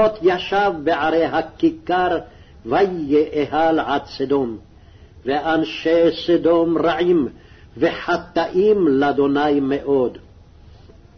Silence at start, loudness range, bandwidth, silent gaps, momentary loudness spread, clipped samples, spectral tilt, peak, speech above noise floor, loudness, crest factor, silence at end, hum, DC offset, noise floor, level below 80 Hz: 0 s; 2 LU; 6.4 kHz; none; 7 LU; under 0.1%; -7 dB/octave; -6 dBFS; 27 dB; -19 LUFS; 14 dB; 1 s; none; under 0.1%; -45 dBFS; -48 dBFS